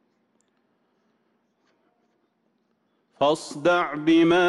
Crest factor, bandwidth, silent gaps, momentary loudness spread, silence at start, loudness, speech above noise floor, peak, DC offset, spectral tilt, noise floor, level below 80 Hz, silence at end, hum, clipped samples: 16 dB; 11.5 kHz; none; 5 LU; 3.2 s; -22 LUFS; 50 dB; -10 dBFS; under 0.1%; -5 dB/octave; -70 dBFS; -66 dBFS; 0 s; none; under 0.1%